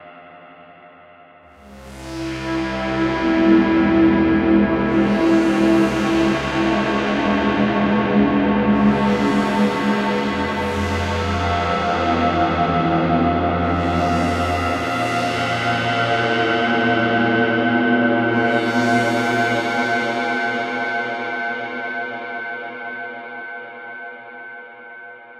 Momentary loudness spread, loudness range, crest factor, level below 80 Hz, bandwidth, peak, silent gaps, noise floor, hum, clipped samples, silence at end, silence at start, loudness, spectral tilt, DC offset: 14 LU; 9 LU; 16 dB; -40 dBFS; 12.5 kHz; -4 dBFS; none; -46 dBFS; none; under 0.1%; 0 s; 0 s; -18 LUFS; -6 dB/octave; under 0.1%